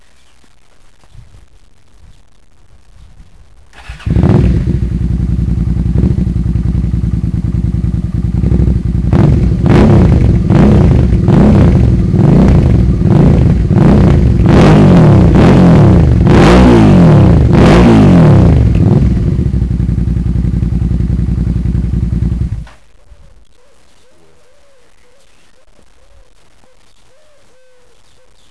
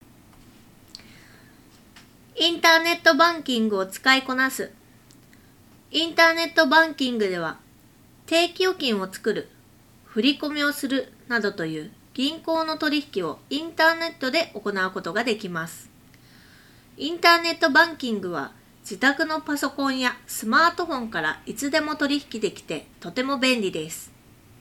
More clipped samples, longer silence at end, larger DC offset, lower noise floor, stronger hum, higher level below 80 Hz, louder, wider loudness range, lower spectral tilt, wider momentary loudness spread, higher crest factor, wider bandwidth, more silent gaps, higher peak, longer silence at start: neither; first, 5.85 s vs 0.55 s; first, 1% vs under 0.1%; second, -48 dBFS vs -53 dBFS; neither; first, -16 dBFS vs -62 dBFS; first, -9 LUFS vs -22 LUFS; first, 11 LU vs 5 LU; first, -9 dB/octave vs -3 dB/octave; second, 10 LU vs 15 LU; second, 8 dB vs 22 dB; second, 11 kHz vs 18.5 kHz; neither; about the same, 0 dBFS vs -2 dBFS; second, 1.15 s vs 1.95 s